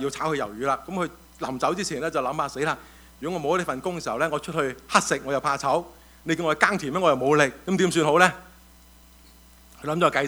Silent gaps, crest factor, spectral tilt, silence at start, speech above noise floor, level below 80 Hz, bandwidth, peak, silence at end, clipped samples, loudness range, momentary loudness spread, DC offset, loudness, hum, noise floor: none; 24 dB; -4.5 dB/octave; 0 s; 27 dB; -54 dBFS; over 20 kHz; 0 dBFS; 0 s; under 0.1%; 5 LU; 12 LU; under 0.1%; -24 LUFS; none; -52 dBFS